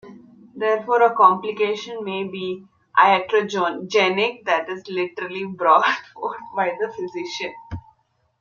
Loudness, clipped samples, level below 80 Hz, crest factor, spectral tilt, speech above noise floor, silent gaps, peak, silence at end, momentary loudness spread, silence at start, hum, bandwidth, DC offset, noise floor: -21 LUFS; under 0.1%; -60 dBFS; 20 dB; -4.5 dB/octave; 44 dB; none; -2 dBFS; 0.6 s; 14 LU; 0.05 s; none; 7.2 kHz; under 0.1%; -64 dBFS